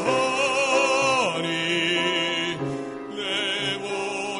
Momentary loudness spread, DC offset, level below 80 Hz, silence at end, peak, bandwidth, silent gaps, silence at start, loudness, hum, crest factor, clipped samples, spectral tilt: 10 LU; under 0.1%; -64 dBFS; 0 s; -8 dBFS; 11 kHz; none; 0 s; -23 LUFS; none; 16 dB; under 0.1%; -3 dB/octave